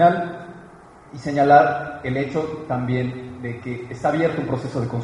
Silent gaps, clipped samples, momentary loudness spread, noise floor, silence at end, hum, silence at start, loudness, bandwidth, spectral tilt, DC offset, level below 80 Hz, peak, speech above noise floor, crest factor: none; under 0.1%; 17 LU; -45 dBFS; 0 s; none; 0 s; -21 LUFS; 10.5 kHz; -7.5 dB/octave; under 0.1%; -54 dBFS; 0 dBFS; 24 dB; 20 dB